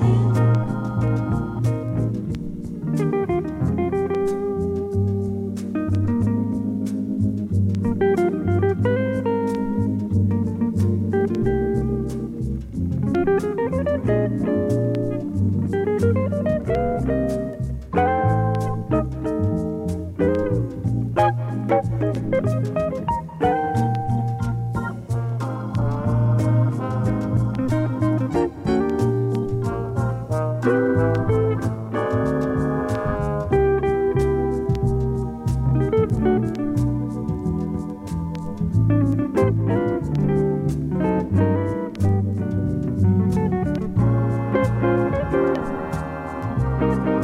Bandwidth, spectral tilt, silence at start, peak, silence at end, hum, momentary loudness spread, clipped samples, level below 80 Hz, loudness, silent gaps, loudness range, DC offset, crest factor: 11.5 kHz; -9 dB/octave; 0 s; -6 dBFS; 0 s; none; 6 LU; under 0.1%; -36 dBFS; -22 LUFS; none; 2 LU; under 0.1%; 14 dB